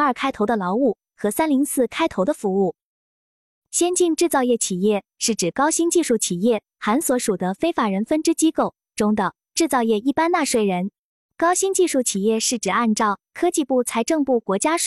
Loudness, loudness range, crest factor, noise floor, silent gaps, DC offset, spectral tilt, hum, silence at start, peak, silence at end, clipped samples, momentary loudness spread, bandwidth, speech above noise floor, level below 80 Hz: -20 LUFS; 2 LU; 14 dB; under -90 dBFS; 2.83-3.62 s, 10.98-11.29 s; under 0.1%; -4 dB/octave; none; 0 s; -6 dBFS; 0 s; under 0.1%; 4 LU; 14 kHz; over 70 dB; -60 dBFS